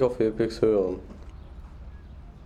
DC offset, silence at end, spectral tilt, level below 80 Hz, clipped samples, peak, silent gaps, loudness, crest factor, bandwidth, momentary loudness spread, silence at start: under 0.1%; 0 s; -7.5 dB/octave; -44 dBFS; under 0.1%; -10 dBFS; none; -25 LUFS; 18 dB; 10.5 kHz; 23 LU; 0 s